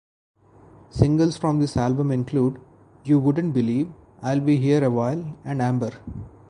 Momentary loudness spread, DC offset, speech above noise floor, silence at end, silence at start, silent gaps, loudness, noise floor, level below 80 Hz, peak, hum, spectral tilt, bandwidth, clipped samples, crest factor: 13 LU; under 0.1%; 29 dB; 0.2 s; 0.95 s; none; -22 LUFS; -50 dBFS; -46 dBFS; -2 dBFS; none; -8 dB/octave; 10.5 kHz; under 0.1%; 20 dB